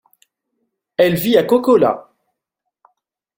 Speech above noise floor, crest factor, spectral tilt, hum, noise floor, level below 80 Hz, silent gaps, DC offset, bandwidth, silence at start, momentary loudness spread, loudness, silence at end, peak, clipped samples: 65 dB; 16 dB; -6 dB/octave; none; -79 dBFS; -58 dBFS; none; under 0.1%; 17 kHz; 1 s; 11 LU; -15 LUFS; 1.35 s; -2 dBFS; under 0.1%